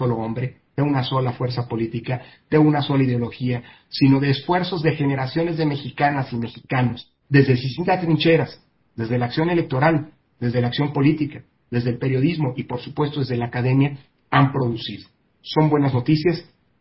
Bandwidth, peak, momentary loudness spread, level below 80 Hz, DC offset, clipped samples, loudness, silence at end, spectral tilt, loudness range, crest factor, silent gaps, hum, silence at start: 5.8 kHz; -2 dBFS; 12 LU; -52 dBFS; under 0.1%; under 0.1%; -21 LUFS; 0.4 s; -11.5 dB/octave; 2 LU; 20 dB; none; none; 0 s